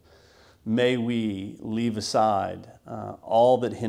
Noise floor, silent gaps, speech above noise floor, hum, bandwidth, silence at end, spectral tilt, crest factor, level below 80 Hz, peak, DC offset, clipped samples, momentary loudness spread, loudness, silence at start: -55 dBFS; none; 31 dB; none; 13 kHz; 0 s; -5.5 dB/octave; 16 dB; -64 dBFS; -10 dBFS; under 0.1%; under 0.1%; 17 LU; -25 LUFS; 0.65 s